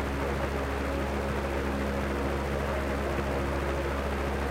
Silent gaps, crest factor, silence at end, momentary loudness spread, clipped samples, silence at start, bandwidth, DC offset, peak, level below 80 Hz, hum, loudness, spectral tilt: none; 14 dB; 0 s; 1 LU; under 0.1%; 0 s; 16 kHz; under 0.1%; -16 dBFS; -34 dBFS; none; -31 LUFS; -6 dB/octave